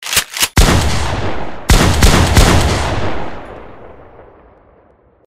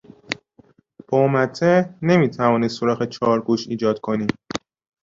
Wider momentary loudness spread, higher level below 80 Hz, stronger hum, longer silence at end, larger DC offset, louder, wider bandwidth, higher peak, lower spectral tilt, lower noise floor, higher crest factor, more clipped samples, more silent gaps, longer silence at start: first, 17 LU vs 13 LU; first, -18 dBFS vs -58 dBFS; neither; first, 0.7 s vs 0.45 s; neither; first, -13 LUFS vs -20 LUFS; first, 16.5 kHz vs 7.8 kHz; first, 0 dBFS vs -4 dBFS; second, -4 dB/octave vs -7 dB/octave; second, -49 dBFS vs -55 dBFS; about the same, 14 dB vs 18 dB; neither; neither; second, 0 s vs 0.3 s